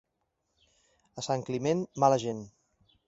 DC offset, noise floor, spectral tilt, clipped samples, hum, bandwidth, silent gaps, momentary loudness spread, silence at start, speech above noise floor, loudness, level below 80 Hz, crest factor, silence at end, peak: under 0.1%; -80 dBFS; -5.5 dB/octave; under 0.1%; none; 8 kHz; none; 19 LU; 1.15 s; 51 dB; -29 LUFS; -70 dBFS; 22 dB; 0.6 s; -10 dBFS